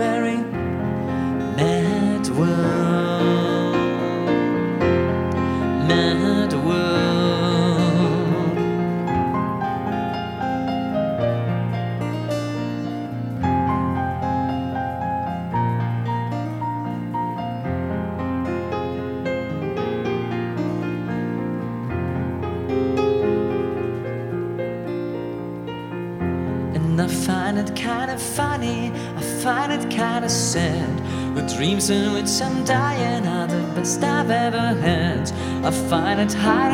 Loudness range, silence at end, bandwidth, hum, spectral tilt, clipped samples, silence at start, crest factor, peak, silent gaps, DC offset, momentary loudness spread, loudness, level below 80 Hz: 6 LU; 0 s; 16 kHz; none; -5.5 dB/octave; under 0.1%; 0 s; 18 dB; -4 dBFS; none; under 0.1%; 7 LU; -22 LUFS; -46 dBFS